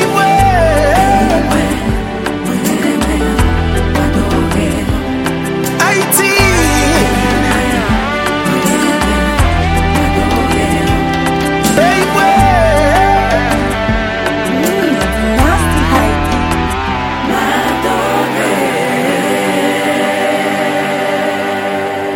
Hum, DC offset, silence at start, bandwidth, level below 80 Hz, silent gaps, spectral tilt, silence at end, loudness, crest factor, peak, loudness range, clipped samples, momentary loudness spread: none; under 0.1%; 0 s; 17 kHz; -22 dBFS; none; -5 dB/octave; 0 s; -12 LUFS; 12 dB; 0 dBFS; 3 LU; under 0.1%; 6 LU